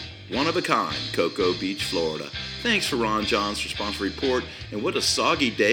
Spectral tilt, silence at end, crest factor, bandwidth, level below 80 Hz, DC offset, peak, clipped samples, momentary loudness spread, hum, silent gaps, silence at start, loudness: -3.5 dB/octave; 0 s; 22 dB; over 20 kHz; -48 dBFS; under 0.1%; -4 dBFS; under 0.1%; 7 LU; none; none; 0 s; -24 LUFS